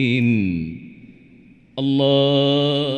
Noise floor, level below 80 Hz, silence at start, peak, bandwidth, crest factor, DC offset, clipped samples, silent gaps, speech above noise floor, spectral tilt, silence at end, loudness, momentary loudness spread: -48 dBFS; -52 dBFS; 0 s; -6 dBFS; 8.8 kHz; 14 dB; under 0.1%; under 0.1%; none; 30 dB; -7.5 dB/octave; 0 s; -18 LUFS; 16 LU